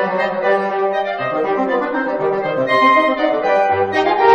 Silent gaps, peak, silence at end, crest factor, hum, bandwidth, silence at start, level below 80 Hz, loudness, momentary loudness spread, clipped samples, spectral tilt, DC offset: none; 0 dBFS; 0 s; 16 dB; none; 9 kHz; 0 s; -56 dBFS; -16 LUFS; 6 LU; under 0.1%; -6 dB/octave; under 0.1%